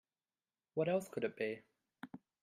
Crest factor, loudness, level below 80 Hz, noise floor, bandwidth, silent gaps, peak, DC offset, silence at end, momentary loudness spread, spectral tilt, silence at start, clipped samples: 18 dB; -40 LUFS; -84 dBFS; under -90 dBFS; 15 kHz; none; -24 dBFS; under 0.1%; 0.25 s; 18 LU; -6.5 dB/octave; 0.75 s; under 0.1%